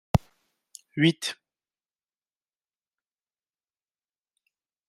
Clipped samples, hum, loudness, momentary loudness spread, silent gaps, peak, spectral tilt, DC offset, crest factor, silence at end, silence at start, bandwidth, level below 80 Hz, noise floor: under 0.1%; none; -26 LUFS; 15 LU; none; -6 dBFS; -5.5 dB/octave; under 0.1%; 26 dB; 3.55 s; 0.15 s; 15.5 kHz; -50 dBFS; under -90 dBFS